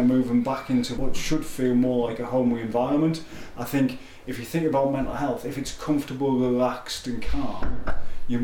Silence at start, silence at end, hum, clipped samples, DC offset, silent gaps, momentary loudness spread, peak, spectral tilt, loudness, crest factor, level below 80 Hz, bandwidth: 0 s; 0 s; none; under 0.1%; under 0.1%; none; 11 LU; -12 dBFS; -6 dB/octave; -26 LUFS; 10 dB; -38 dBFS; 18 kHz